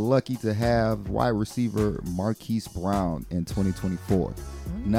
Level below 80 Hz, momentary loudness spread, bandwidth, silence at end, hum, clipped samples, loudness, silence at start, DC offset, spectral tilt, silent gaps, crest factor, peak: -40 dBFS; 7 LU; 16 kHz; 0 s; none; under 0.1%; -27 LUFS; 0 s; under 0.1%; -7 dB/octave; none; 16 dB; -8 dBFS